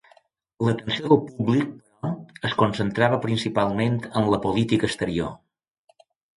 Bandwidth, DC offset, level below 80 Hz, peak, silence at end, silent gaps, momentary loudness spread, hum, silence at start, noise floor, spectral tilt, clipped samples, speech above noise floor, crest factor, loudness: 11.5 kHz; under 0.1%; -52 dBFS; -4 dBFS; 1 s; none; 11 LU; none; 0.6 s; -59 dBFS; -6.5 dB/octave; under 0.1%; 37 dB; 20 dB; -24 LUFS